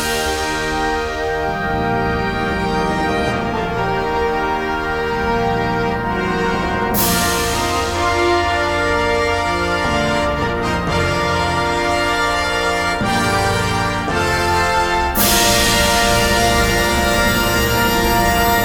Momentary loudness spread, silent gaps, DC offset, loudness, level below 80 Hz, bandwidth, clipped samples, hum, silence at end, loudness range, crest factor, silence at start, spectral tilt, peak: 6 LU; none; under 0.1%; -16 LUFS; -28 dBFS; 18 kHz; under 0.1%; none; 0 s; 5 LU; 16 dB; 0 s; -3.5 dB/octave; 0 dBFS